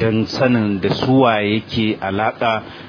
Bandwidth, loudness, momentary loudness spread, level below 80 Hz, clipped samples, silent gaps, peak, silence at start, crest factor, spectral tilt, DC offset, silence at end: 5.4 kHz; -17 LUFS; 6 LU; -50 dBFS; under 0.1%; none; 0 dBFS; 0 s; 16 dB; -7 dB/octave; under 0.1%; 0 s